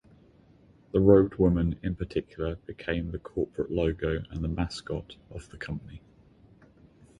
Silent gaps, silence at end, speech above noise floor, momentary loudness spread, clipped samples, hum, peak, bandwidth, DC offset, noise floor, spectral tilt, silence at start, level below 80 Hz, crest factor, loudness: none; 1.2 s; 30 dB; 18 LU; under 0.1%; none; -6 dBFS; 10.5 kHz; under 0.1%; -58 dBFS; -8 dB/octave; 0.95 s; -42 dBFS; 22 dB; -28 LUFS